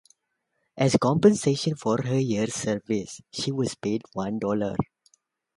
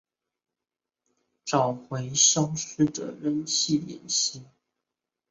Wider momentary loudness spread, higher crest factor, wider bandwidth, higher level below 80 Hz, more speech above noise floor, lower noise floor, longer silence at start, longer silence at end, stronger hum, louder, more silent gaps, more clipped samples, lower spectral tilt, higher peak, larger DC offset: about the same, 11 LU vs 12 LU; about the same, 20 dB vs 20 dB; first, 11.5 kHz vs 8.2 kHz; first, -58 dBFS vs -66 dBFS; second, 53 dB vs 63 dB; second, -77 dBFS vs -89 dBFS; second, 0.75 s vs 1.45 s; second, 0.7 s vs 0.85 s; neither; about the same, -25 LUFS vs -25 LUFS; neither; neither; first, -5.5 dB/octave vs -3 dB/octave; about the same, -6 dBFS vs -8 dBFS; neither